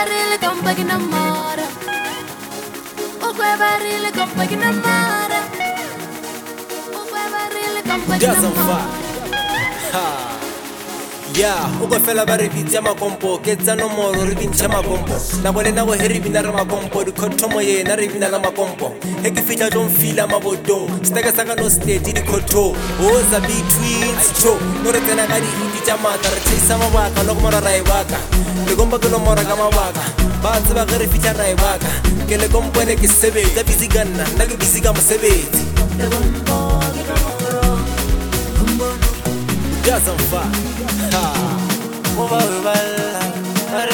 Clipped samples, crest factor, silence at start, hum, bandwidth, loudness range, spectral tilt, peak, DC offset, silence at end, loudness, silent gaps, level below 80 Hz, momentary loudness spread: under 0.1%; 16 dB; 0 s; none; 19.5 kHz; 5 LU; -3.5 dB/octave; 0 dBFS; under 0.1%; 0 s; -16 LUFS; none; -24 dBFS; 9 LU